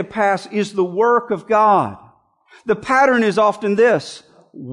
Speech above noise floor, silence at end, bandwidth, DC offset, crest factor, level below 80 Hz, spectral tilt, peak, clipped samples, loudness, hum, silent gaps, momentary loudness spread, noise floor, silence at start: 35 dB; 0 s; 11 kHz; under 0.1%; 14 dB; -60 dBFS; -5.5 dB/octave; -4 dBFS; under 0.1%; -16 LUFS; none; none; 10 LU; -51 dBFS; 0 s